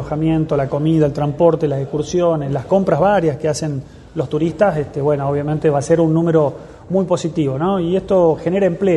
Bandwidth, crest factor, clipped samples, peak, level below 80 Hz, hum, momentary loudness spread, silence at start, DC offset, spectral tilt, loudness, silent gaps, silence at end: 11.5 kHz; 16 dB; under 0.1%; 0 dBFS; -44 dBFS; none; 7 LU; 0 s; under 0.1%; -7.5 dB/octave; -17 LUFS; none; 0 s